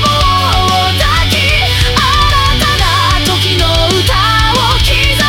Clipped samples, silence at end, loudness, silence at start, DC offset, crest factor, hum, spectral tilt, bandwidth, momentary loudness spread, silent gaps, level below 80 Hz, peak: under 0.1%; 0 s; -9 LUFS; 0 s; under 0.1%; 10 dB; none; -3.5 dB/octave; 17.5 kHz; 1 LU; none; -18 dBFS; 0 dBFS